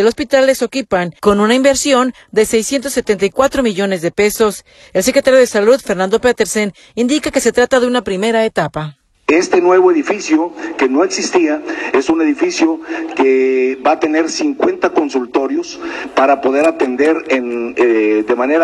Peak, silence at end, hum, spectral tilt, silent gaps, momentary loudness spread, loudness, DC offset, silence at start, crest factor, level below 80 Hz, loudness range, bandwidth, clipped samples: 0 dBFS; 0 s; none; -4 dB/octave; none; 8 LU; -14 LUFS; under 0.1%; 0 s; 14 dB; -46 dBFS; 2 LU; 13 kHz; under 0.1%